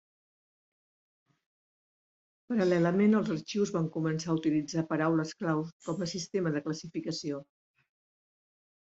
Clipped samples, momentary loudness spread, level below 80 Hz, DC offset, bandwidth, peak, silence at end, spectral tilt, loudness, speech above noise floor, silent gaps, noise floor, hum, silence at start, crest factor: under 0.1%; 10 LU; -72 dBFS; under 0.1%; 8 kHz; -14 dBFS; 1.5 s; -6 dB/octave; -31 LUFS; over 60 dB; 5.73-5.80 s; under -90 dBFS; none; 2.5 s; 18 dB